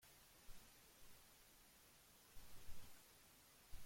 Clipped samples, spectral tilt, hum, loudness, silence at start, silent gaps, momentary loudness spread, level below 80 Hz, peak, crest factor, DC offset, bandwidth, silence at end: under 0.1%; -2.5 dB/octave; none; -66 LUFS; 0 s; none; 4 LU; -68 dBFS; -40 dBFS; 16 dB; under 0.1%; 16.5 kHz; 0 s